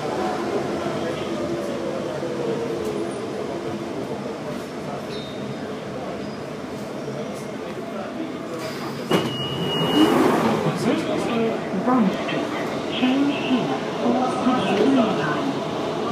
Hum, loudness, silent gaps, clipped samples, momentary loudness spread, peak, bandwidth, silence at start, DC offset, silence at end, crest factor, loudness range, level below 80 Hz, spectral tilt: none; -24 LUFS; none; under 0.1%; 12 LU; -4 dBFS; 15.5 kHz; 0 s; under 0.1%; 0 s; 18 dB; 10 LU; -58 dBFS; -5.5 dB/octave